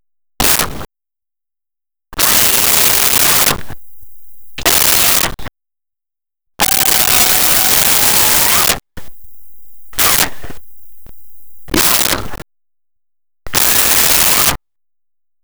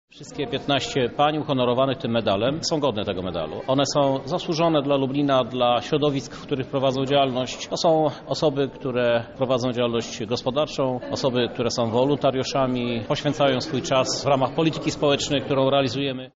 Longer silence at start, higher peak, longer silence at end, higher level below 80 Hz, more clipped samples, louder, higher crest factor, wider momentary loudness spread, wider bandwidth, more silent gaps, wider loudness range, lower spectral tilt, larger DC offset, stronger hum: second, 0 s vs 0.15 s; first, 0 dBFS vs -8 dBFS; about the same, 0 s vs 0.1 s; first, -36 dBFS vs -52 dBFS; neither; first, -9 LUFS vs -23 LUFS; about the same, 14 dB vs 14 dB; first, 11 LU vs 6 LU; first, over 20 kHz vs 8 kHz; neither; first, 6 LU vs 2 LU; second, -0.5 dB/octave vs -4.5 dB/octave; neither; neither